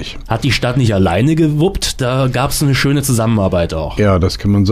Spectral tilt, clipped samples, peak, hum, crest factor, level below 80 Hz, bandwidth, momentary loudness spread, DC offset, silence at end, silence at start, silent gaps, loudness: -5.5 dB/octave; under 0.1%; -4 dBFS; none; 10 dB; -28 dBFS; 15.5 kHz; 4 LU; under 0.1%; 0 s; 0 s; none; -14 LUFS